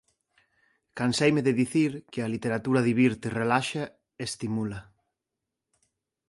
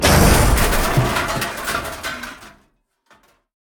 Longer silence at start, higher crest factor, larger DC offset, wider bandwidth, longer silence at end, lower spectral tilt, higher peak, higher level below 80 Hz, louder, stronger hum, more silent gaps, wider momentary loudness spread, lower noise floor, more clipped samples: first, 0.95 s vs 0 s; about the same, 20 dB vs 18 dB; neither; second, 11.5 kHz vs 19.5 kHz; first, 1.5 s vs 1.15 s; first, -5.5 dB/octave vs -4 dB/octave; second, -8 dBFS vs 0 dBFS; second, -62 dBFS vs -24 dBFS; second, -27 LUFS vs -18 LUFS; neither; neither; second, 12 LU vs 15 LU; first, -86 dBFS vs -62 dBFS; neither